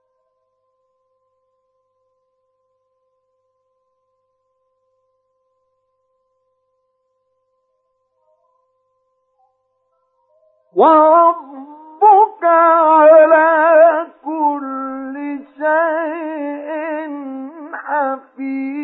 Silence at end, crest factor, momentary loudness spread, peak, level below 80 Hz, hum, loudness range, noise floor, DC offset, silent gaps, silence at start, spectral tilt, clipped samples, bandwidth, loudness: 0 s; 18 dB; 18 LU; 0 dBFS; -80 dBFS; 50 Hz at -90 dBFS; 11 LU; -68 dBFS; under 0.1%; none; 10.75 s; -8.5 dB/octave; under 0.1%; 4 kHz; -14 LUFS